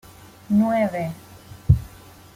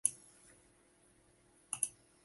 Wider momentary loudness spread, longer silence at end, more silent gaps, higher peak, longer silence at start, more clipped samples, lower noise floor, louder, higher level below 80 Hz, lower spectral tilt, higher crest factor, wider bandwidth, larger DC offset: second, 18 LU vs 25 LU; first, 0.5 s vs 0.35 s; neither; first, -2 dBFS vs -10 dBFS; first, 0.5 s vs 0.05 s; neither; second, -45 dBFS vs -69 dBFS; first, -22 LUFS vs -39 LUFS; first, -36 dBFS vs -78 dBFS; first, -8.5 dB/octave vs 0.5 dB/octave; second, 22 dB vs 36 dB; first, 16 kHz vs 12 kHz; neither